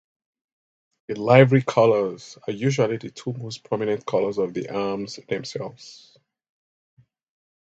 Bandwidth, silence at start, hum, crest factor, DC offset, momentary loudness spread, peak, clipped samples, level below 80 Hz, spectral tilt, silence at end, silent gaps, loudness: 8 kHz; 1.1 s; none; 24 dB; under 0.1%; 17 LU; 0 dBFS; under 0.1%; -64 dBFS; -6.5 dB/octave; 1.7 s; none; -22 LUFS